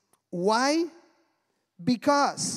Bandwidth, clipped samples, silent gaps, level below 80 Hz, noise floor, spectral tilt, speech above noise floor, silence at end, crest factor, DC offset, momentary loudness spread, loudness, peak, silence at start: 15 kHz; under 0.1%; none; -74 dBFS; -75 dBFS; -3.5 dB/octave; 50 dB; 0 s; 18 dB; under 0.1%; 11 LU; -26 LUFS; -8 dBFS; 0.35 s